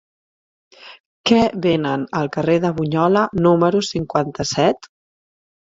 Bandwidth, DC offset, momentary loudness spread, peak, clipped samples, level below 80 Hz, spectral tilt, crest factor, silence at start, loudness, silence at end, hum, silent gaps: 7.8 kHz; under 0.1%; 6 LU; -2 dBFS; under 0.1%; -50 dBFS; -5.5 dB/octave; 18 dB; 0.85 s; -18 LUFS; 0.95 s; none; 1.00-1.24 s